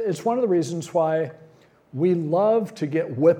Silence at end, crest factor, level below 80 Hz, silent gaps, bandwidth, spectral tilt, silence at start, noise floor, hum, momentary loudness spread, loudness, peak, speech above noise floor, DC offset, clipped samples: 0 s; 16 dB; -74 dBFS; none; 15 kHz; -7.5 dB/octave; 0 s; -53 dBFS; none; 6 LU; -23 LUFS; -6 dBFS; 32 dB; under 0.1%; under 0.1%